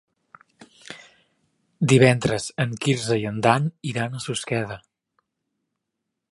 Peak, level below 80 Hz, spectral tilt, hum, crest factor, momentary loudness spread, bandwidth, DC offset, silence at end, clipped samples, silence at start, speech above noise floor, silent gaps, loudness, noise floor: -2 dBFS; -58 dBFS; -5.5 dB/octave; none; 22 dB; 24 LU; 11.5 kHz; under 0.1%; 1.55 s; under 0.1%; 0.6 s; 60 dB; none; -22 LUFS; -81 dBFS